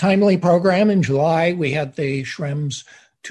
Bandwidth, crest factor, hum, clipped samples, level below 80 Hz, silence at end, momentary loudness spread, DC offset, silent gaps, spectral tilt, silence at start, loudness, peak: 10.5 kHz; 14 dB; none; under 0.1%; -56 dBFS; 0 s; 10 LU; under 0.1%; none; -6.5 dB/octave; 0 s; -18 LUFS; -4 dBFS